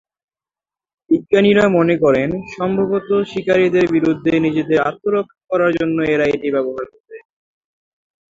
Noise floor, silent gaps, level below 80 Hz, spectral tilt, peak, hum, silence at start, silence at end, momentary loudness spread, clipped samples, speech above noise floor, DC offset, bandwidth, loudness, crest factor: under -90 dBFS; 7.00-7.04 s; -52 dBFS; -7 dB/octave; -2 dBFS; none; 1.1 s; 1.1 s; 8 LU; under 0.1%; over 74 dB; under 0.1%; 7.6 kHz; -16 LUFS; 16 dB